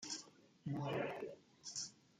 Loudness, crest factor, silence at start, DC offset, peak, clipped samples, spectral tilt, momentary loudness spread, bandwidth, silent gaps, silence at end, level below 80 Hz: -46 LUFS; 18 dB; 0 s; under 0.1%; -28 dBFS; under 0.1%; -4 dB/octave; 11 LU; 12.5 kHz; none; 0.25 s; -82 dBFS